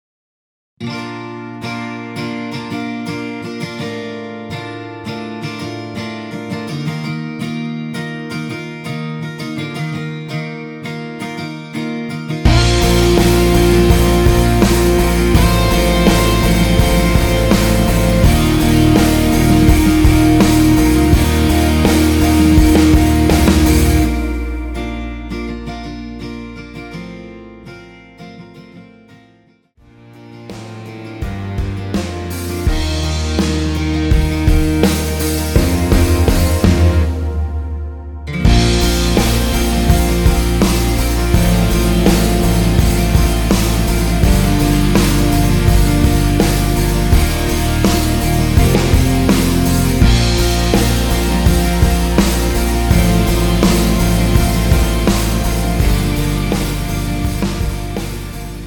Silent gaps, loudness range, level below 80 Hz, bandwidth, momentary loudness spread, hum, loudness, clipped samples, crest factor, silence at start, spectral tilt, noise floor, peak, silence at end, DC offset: none; 13 LU; -18 dBFS; over 20 kHz; 15 LU; none; -14 LUFS; under 0.1%; 14 dB; 0.8 s; -5.5 dB/octave; -51 dBFS; 0 dBFS; 0 s; under 0.1%